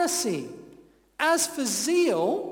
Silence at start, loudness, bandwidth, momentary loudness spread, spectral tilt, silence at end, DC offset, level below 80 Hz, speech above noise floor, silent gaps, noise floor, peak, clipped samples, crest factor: 0 s; -25 LUFS; 18.5 kHz; 12 LU; -2.5 dB/octave; 0 s; under 0.1%; -68 dBFS; 29 dB; none; -54 dBFS; -10 dBFS; under 0.1%; 16 dB